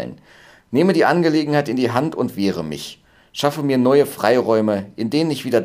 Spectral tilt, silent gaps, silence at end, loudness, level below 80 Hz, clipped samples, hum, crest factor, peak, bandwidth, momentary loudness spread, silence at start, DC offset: -6 dB/octave; none; 0 s; -18 LUFS; -58 dBFS; under 0.1%; none; 18 dB; 0 dBFS; 16 kHz; 12 LU; 0 s; under 0.1%